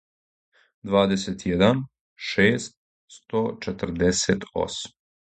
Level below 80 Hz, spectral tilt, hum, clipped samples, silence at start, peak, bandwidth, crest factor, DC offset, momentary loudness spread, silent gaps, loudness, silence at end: -48 dBFS; -4.5 dB/octave; none; under 0.1%; 0.85 s; -2 dBFS; 9.2 kHz; 22 dB; under 0.1%; 14 LU; 2.01-2.16 s, 2.77-3.08 s; -24 LUFS; 0.4 s